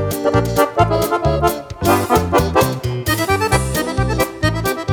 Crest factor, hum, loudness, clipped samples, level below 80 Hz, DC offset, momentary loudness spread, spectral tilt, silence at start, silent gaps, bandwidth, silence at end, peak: 14 dB; none; -17 LUFS; under 0.1%; -30 dBFS; under 0.1%; 4 LU; -5.5 dB/octave; 0 s; none; over 20 kHz; 0 s; -2 dBFS